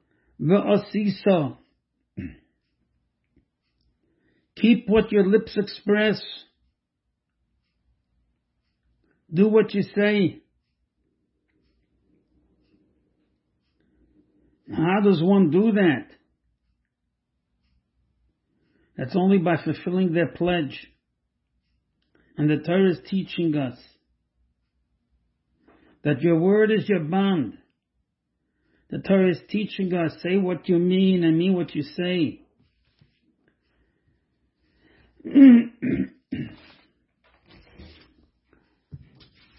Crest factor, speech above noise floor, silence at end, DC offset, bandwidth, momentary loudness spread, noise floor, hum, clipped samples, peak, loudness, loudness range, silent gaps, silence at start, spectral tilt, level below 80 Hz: 22 dB; 59 dB; 0.6 s; under 0.1%; 5.8 kHz; 15 LU; -79 dBFS; none; under 0.1%; -2 dBFS; -21 LUFS; 10 LU; none; 0.4 s; -11.5 dB/octave; -60 dBFS